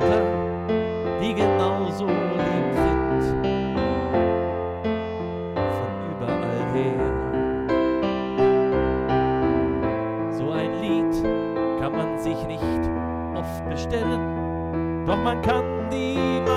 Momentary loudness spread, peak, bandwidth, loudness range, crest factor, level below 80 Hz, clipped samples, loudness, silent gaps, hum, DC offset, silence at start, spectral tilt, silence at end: 6 LU; -12 dBFS; 13.5 kHz; 3 LU; 12 dB; -38 dBFS; under 0.1%; -24 LUFS; none; none; under 0.1%; 0 s; -7.5 dB/octave; 0 s